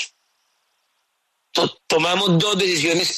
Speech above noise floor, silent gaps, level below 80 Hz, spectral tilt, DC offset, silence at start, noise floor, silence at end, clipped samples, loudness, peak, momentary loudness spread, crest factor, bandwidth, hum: 53 dB; none; -62 dBFS; -3.5 dB/octave; under 0.1%; 0 s; -71 dBFS; 0 s; under 0.1%; -19 LUFS; -6 dBFS; 6 LU; 14 dB; 13.5 kHz; none